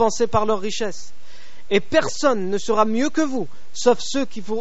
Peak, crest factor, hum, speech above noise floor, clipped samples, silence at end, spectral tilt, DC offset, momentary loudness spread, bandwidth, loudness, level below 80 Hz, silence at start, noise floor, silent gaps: -2 dBFS; 18 dB; none; 24 dB; under 0.1%; 0 s; -3.5 dB/octave; 7%; 9 LU; 8 kHz; -21 LUFS; -52 dBFS; 0 s; -45 dBFS; none